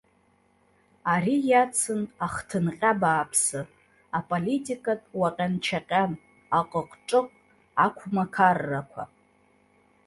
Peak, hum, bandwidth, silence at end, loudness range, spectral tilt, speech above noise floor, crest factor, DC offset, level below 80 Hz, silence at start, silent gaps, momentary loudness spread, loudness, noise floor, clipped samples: -6 dBFS; none; 12 kHz; 1 s; 3 LU; -4.5 dB/octave; 39 dB; 20 dB; under 0.1%; -62 dBFS; 1.05 s; none; 11 LU; -26 LUFS; -65 dBFS; under 0.1%